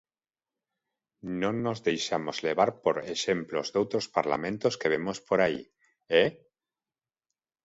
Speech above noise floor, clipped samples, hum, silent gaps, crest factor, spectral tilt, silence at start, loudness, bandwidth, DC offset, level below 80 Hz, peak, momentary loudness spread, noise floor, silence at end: over 62 dB; under 0.1%; none; none; 22 dB; -4.5 dB/octave; 1.25 s; -29 LUFS; 8 kHz; under 0.1%; -66 dBFS; -8 dBFS; 5 LU; under -90 dBFS; 1.3 s